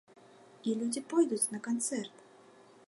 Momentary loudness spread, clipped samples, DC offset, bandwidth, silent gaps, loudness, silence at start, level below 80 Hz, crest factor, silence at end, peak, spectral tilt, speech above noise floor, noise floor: 10 LU; under 0.1%; under 0.1%; 11.5 kHz; none; -33 LUFS; 0.65 s; -88 dBFS; 18 dB; 0.8 s; -16 dBFS; -3.5 dB/octave; 26 dB; -59 dBFS